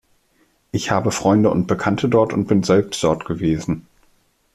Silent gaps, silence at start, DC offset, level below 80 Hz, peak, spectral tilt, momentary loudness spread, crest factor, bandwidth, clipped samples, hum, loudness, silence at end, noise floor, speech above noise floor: none; 0.75 s; under 0.1%; -48 dBFS; -2 dBFS; -6 dB/octave; 9 LU; 16 dB; 14 kHz; under 0.1%; none; -19 LUFS; 0.75 s; -61 dBFS; 43 dB